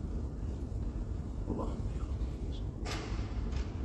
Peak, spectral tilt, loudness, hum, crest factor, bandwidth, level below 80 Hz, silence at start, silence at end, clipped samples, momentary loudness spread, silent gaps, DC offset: -22 dBFS; -7 dB/octave; -39 LUFS; none; 14 dB; 8.8 kHz; -38 dBFS; 0 s; 0 s; under 0.1%; 2 LU; none; under 0.1%